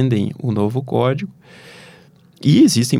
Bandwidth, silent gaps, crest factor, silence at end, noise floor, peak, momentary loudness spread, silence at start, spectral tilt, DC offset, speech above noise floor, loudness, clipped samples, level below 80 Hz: 16 kHz; none; 14 dB; 0 s; -48 dBFS; -2 dBFS; 11 LU; 0 s; -6 dB/octave; under 0.1%; 31 dB; -17 LUFS; under 0.1%; -60 dBFS